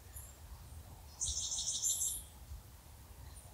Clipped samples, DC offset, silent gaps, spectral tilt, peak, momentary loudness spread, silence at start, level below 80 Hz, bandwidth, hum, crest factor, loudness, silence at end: under 0.1%; under 0.1%; none; -0.5 dB/octave; -22 dBFS; 21 LU; 0 s; -56 dBFS; 16 kHz; none; 20 dB; -36 LUFS; 0 s